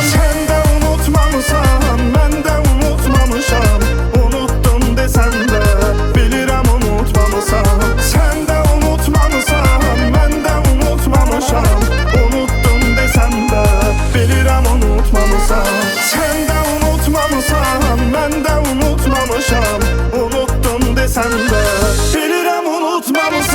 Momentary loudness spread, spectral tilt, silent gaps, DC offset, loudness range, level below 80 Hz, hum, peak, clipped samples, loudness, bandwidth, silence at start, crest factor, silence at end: 2 LU; -5 dB/octave; none; under 0.1%; 1 LU; -14 dBFS; none; 0 dBFS; under 0.1%; -13 LUFS; 18.5 kHz; 0 s; 12 dB; 0 s